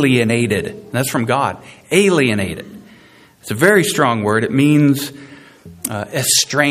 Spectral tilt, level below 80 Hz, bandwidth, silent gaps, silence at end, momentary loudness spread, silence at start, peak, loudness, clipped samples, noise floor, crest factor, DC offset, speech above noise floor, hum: -4 dB/octave; -54 dBFS; 15.5 kHz; none; 0 s; 14 LU; 0 s; 0 dBFS; -15 LUFS; under 0.1%; -46 dBFS; 16 dB; under 0.1%; 31 dB; none